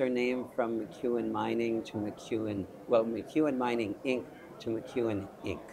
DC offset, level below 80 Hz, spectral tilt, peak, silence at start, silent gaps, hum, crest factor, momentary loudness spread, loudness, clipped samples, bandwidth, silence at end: under 0.1%; -66 dBFS; -6.5 dB/octave; -14 dBFS; 0 s; none; none; 18 dB; 8 LU; -33 LUFS; under 0.1%; 15 kHz; 0 s